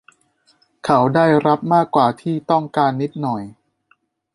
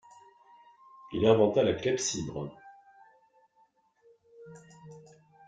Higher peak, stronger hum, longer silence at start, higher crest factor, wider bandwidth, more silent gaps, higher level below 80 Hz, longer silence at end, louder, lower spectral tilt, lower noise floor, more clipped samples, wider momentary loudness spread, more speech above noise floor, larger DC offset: first, -2 dBFS vs -8 dBFS; neither; second, 0.85 s vs 1.05 s; second, 16 dB vs 24 dB; first, 11.5 kHz vs 9.4 kHz; neither; about the same, -60 dBFS vs -64 dBFS; first, 0.85 s vs 0.5 s; first, -17 LUFS vs -28 LUFS; first, -7.5 dB/octave vs -4.5 dB/octave; second, -62 dBFS vs -68 dBFS; neither; second, 11 LU vs 28 LU; about the same, 45 dB vs 42 dB; neither